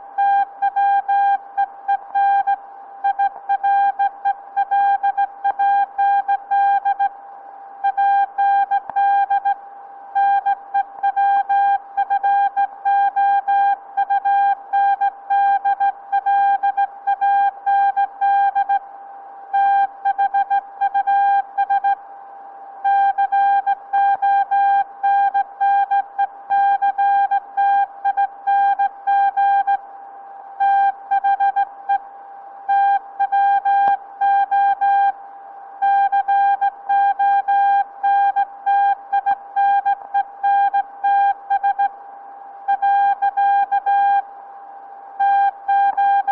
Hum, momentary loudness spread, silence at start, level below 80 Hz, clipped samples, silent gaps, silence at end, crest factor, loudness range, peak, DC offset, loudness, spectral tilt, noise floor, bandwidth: none; 8 LU; 0 s; -72 dBFS; under 0.1%; none; 0 s; 14 dB; 2 LU; -4 dBFS; under 0.1%; -18 LUFS; -3 dB/octave; -38 dBFS; 4.2 kHz